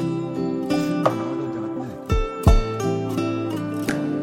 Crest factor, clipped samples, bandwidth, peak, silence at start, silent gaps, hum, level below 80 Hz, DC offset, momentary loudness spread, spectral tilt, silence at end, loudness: 20 dB; under 0.1%; 16.5 kHz; -2 dBFS; 0 s; none; none; -28 dBFS; under 0.1%; 8 LU; -7 dB/octave; 0 s; -24 LUFS